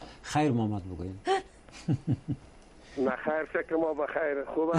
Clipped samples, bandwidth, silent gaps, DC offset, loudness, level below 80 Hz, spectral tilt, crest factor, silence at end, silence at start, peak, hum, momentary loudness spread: under 0.1%; 11 kHz; none; under 0.1%; -31 LUFS; -56 dBFS; -6.5 dB/octave; 16 dB; 0 s; 0 s; -14 dBFS; none; 12 LU